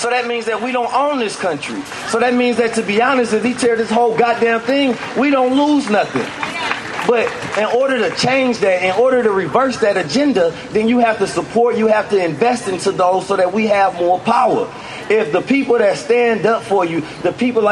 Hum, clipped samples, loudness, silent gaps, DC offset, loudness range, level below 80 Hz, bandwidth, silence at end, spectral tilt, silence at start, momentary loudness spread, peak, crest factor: none; under 0.1%; -16 LUFS; none; under 0.1%; 1 LU; -56 dBFS; 11.5 kHz; 0 s; -4.5 dB/octave; 0 s; 6 LU; 0 dBFS; 14 dB